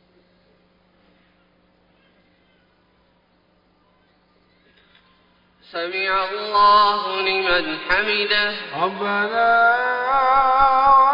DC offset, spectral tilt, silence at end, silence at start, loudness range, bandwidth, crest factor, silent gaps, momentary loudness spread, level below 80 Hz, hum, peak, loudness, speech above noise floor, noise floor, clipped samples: under 0.1%; -5 dB/octave; 0 s; 5.75 s; 11 LU; 5.4 kHz; 16 dB; none; 10 LU; -50 dBFS; none; -4 dBFS; -18 LUFS; 42 dB; -60 dBFS; under 0.1%